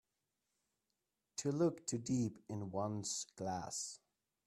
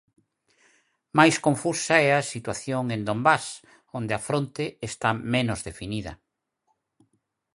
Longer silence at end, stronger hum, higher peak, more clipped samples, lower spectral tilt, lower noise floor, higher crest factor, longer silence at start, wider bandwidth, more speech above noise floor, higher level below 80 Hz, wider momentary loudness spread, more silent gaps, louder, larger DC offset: second, 0.5 s vs 1.4 s; neither; second, -24 dBFS vs -2 dBFS; neither; about the same, -5 dB/octave vs -4.5 dB/octave; first, -89 dBFS vs -74 dBFS; second, 18 dB vs 24 dB; first, 1.35 s vs 1.15 s; first, 13.5 kHz vs 11.5 kHz; about the same, 48 dB vs 50 dB; second, -76 dBFS vs -56 dBFS; second, 10 LU vs 14 LU; neither; second, -41 LUFS vs -25 LUFS; neither